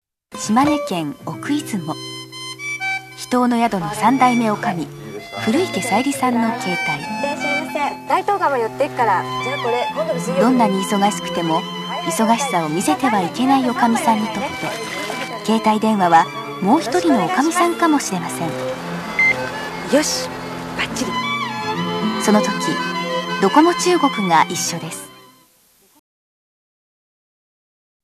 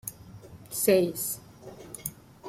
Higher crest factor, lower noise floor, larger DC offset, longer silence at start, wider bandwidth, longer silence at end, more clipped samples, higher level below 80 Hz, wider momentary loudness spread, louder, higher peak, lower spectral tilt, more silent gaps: about the same, 18 dB vs 20 dB; first, -55 dBFS vs -48 dBFS; neither; first, 0.3 s vs 0.05 s; second, 14 kHz vs 16.5 kHz; first, 2.85 s vs 0 s; neither; first, -56 dBFS vs -62 dBFS; second, 10 LU vs 25 LU; first, -18 LUFS vs -28 LUFS; first, 0 dBFS vs -10 dBFS; about the same, -4 dB/octave vs -4 dB/octave; neither